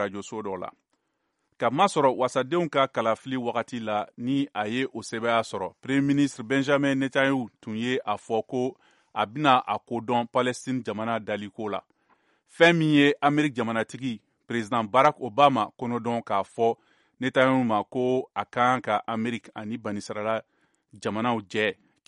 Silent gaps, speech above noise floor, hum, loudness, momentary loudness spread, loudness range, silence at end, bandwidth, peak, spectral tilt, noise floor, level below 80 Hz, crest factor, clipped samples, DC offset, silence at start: none; 51 dB; none; -26 LUFS; 12 LU; 4 LU; 0.35 s; 11.5 kHz; -4 dBFS; -5.5 dB/octave; -76 dBFS; -70 dBFS; 22 dB; under 0.1%; under 0.1%; 0 s